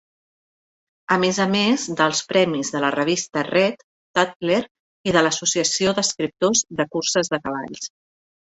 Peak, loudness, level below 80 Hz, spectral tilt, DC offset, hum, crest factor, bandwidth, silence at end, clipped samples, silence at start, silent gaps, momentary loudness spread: -2 dBFS; -20 LUFS; -60 dBFS; -3 dB/octave; under 0.1%; none; 20 dB; 8.4 kHz; 0.7 s; under 0.1%; 1.1 s; 3.83-4.14 s, 4.36-4.40 s, 4.71-5.04 s; 10 LU